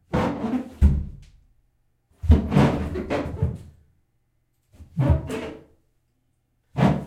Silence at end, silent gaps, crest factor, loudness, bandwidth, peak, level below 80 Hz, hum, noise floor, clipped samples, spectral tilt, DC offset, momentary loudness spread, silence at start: 0 s; none; 20 dB; -24 LUFS; 10 kHz; -4 dBFS; -30 dBFS; none; -69 dBFS; under 0.1%; -8.5 dB/octave; under 0.1%; 15 LU; 0.1 s